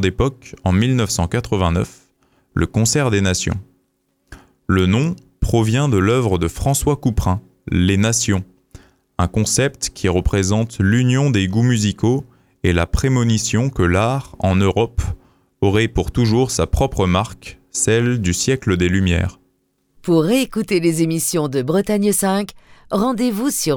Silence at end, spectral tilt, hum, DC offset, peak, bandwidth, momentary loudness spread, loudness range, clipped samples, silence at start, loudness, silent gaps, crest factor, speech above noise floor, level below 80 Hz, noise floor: 0 s; -5 dB/octave; none; under 0.1%; -4 dBFS; 19 kHz; 7 LU; 2 LU; under 0.1%; 0 s; -18 LUFS; none; 14 dB; 49 dB; -32 dBFS; -66 dBFS